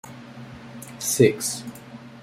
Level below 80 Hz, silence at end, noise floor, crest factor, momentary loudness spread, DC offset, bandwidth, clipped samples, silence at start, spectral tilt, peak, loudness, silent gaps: -62 dBFS; 0 s; -42 dBFS; 22 dB; 23 LU; under 0.1%; 16 kHz; under 0.1%; 0.05 s; -4.5 dB/octave; -4 dBFS; -22 LUFS; none